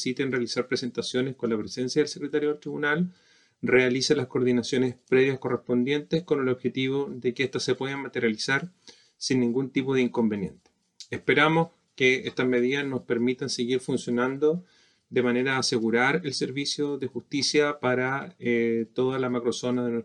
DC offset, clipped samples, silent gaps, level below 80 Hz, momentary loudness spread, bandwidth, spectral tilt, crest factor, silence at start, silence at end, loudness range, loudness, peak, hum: under 0.1%; under 0.1%; none; -70 dBFS; 7 LU; 10.5 kHz; -4.5 dB/octave; 18 dB; 0 s; 0 s; 3 LU; -26 LUFS; -8 dBFS; none